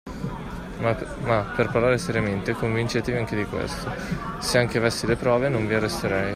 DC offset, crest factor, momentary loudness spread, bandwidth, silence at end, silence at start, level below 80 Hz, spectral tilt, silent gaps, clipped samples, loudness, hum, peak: under 0.1%; 18 dB; 9 LU; 15 kHz; 0 s; 0.05 s; -42 dBFS; -5.5 dB/octave; none; under 0.1%; -24 LUFS; none; -6 dBFS